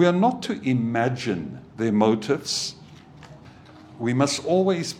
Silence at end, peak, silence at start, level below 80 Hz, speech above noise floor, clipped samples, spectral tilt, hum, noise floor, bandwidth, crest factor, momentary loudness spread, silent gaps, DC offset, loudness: 0 s; -4 dBFS; 0 s; -62 dBFS; 24 dB; under 0.1%; -5.5 dB/octave; none; -46 dBFS; 15 kHz; 20 dB; 9 LU; none; under 0.1%; -23 LUFS